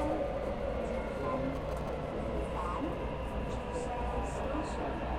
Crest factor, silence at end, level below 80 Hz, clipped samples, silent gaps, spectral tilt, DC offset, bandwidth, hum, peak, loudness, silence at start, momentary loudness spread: 12 dB; 0 s; -42 dBFS; under 0.1%; none; -7 dB/octave; under 0.1%; 12.5 kHz; none; -22 dBFS; -36 LUFS; 0 s; 3 LU